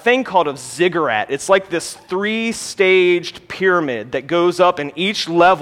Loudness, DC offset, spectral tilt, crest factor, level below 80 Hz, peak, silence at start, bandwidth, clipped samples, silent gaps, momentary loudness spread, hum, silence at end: -17 LUFS; under 0.1%; -4 dB/octave; 16 dB; -58 dBFS; 0 dBFS; 0.05 s; 14.5 kHz; under 0.1%; none; 9 LU; none; 0 s